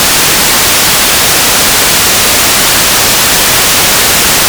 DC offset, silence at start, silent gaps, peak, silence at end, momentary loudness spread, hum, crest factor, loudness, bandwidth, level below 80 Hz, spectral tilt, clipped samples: under 0.1%; 0 s; none; 0 dBFS; 0 s; 0 LU; none; 6 dB; -4 LUFS; over 20 kHz; -28 dBFS; -0.5 dB/octave; 8%